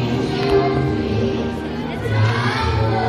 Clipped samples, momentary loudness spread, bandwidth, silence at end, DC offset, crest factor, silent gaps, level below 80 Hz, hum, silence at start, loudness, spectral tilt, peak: under 0.1%; 7 LU; 11 kHz; 0 s; under 0.1%; 14 dB; none; -34 dBFS; none; 0 s; -19 LUFS; -7 dB/octave; -4 dBFS